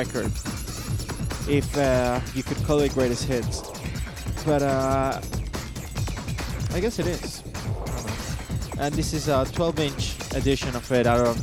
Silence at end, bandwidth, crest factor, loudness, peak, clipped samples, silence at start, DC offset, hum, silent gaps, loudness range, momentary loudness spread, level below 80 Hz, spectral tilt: 0 s; 19 kHz; 18 dB; -26 LUFS; -8 dBFS; under 0.1%; 0 s; under 0.1%; none; none; 4 LU; 10 LU; -36 dBFS; -5.5 dB/octave